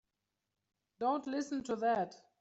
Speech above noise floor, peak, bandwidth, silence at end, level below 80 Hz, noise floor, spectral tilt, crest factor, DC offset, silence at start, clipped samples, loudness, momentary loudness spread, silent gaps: 52 dB; -22 dBFS; 8.2 kHz; 0.25 s; -78 dBFS; -88 dBFS; -5 dB/octave; 16 dB; under 0.1%; 1 s; under 0.1%; -36 LUFS; 5 LU; none